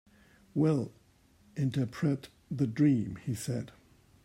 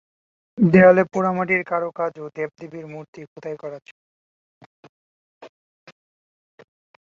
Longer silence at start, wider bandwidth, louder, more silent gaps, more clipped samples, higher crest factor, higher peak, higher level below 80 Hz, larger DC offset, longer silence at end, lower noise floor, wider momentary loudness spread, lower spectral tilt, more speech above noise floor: about the same, 0.55 s vs 0.55 s; first, 16 kHz vs 7.2 kHz; second, -32 LUFS vs -19 LUFS; second, none vs 3.08-3.13 s, 3.27-3.36 s, 3.91-4.83 s, 4.89-5.41 s; neither; second, 16 dB vs 22 dB; second, -16 dBFS vs -2 dBFS; about the same, -64 dBFS vs -62 dBFS; neither; second, 0.55 s vs 1.55 s; second, -63 dBFS vs under -90 dBFS; second, 14 LU vs 25 LU; second, -7.5 dB/octave vs -9 dB/octave; second, 33 dB vs over 70 dB